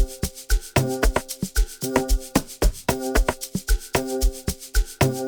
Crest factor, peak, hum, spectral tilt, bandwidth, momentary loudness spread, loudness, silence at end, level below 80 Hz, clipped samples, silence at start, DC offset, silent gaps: 20 dB; -2 dBFS; none; -4.5 dB/octave; 19 kHz; 5 LU; -25 LUFS; 0 s; -26 dBFS; under 0.1%; 0 s; under 0.1%; none